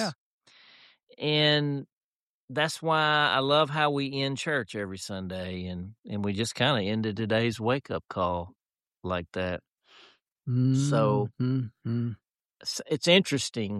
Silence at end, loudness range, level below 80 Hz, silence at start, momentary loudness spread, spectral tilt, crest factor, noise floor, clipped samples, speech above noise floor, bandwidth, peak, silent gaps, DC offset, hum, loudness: 0 s; 5 LU; -62 dBFS; 0 s; 13 LU; -5 dB/octave; 20 dB; under -90 dBFS; under 0.1%; over 63 dB; 13 kHz; -8 dBFS; 0.16-0.41 s, 1.03-1.07 s, 1.92-2.48 s, 5.99-6.03 s, 9.72-9.76 s; under 0.1%; none; -27 LUFS